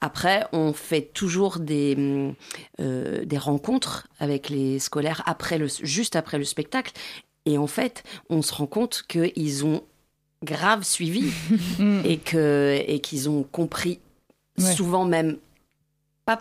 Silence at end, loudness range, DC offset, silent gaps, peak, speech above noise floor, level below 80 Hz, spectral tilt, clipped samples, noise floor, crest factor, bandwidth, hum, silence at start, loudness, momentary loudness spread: 0 s; 4 LU; under 0.1%; none; -6 dBFS; 48 dB; -58 dBFS; -4.5 dB/octave; under 0.1%; -72 dBFS; 18 dB; 15.5 kHz; none; 0 s; -25 LUFS; 9 LU